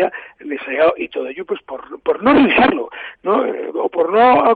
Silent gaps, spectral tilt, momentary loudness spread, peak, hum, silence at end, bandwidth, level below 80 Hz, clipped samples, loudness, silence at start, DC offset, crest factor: none; -7.5 dB/octave; 15 LU; -4 dBFS; none; 0 s; 4.8 kHz; -50 dBFS; under 0.1%; -16 LUFS; 0 s; under 0.1%; 12 dB